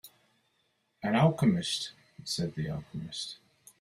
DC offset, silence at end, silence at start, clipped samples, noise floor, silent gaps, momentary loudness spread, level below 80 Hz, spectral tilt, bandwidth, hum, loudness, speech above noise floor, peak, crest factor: under 0.1%; 0.45 s; 0.05 s; under 0.1%; -75 dBFS; none; 16 LU; -64 dBFS; -5.5 dB/octave; 15.5 kHz; none; -31 LUFS; 45 dB; -12 dBFS; 20 dB